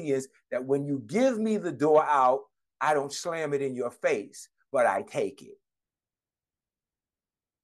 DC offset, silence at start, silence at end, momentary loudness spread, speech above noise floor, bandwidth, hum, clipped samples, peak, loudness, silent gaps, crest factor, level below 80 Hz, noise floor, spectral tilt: under 0.1%; 0 s; 2.1 s; 10 LU; over 63 dB; 12.5 kHz; none; under 0.1%; -10 dBFS; -28 LUFS; none; 18 dB; -80 dBFS; under -90 dBFS; -5 dB/octave